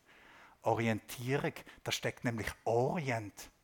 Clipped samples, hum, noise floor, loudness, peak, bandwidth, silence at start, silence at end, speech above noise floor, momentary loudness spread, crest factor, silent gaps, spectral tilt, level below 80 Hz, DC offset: under 0.1%; none; -60 dBFS; -36 LUFS; -16 dBFS; 18 kHz; 0.3 s; 0.15 s; 24 dB; 7 LU; 20 dB; none; -5 dB/octave; -64 dBFS; under 0.1%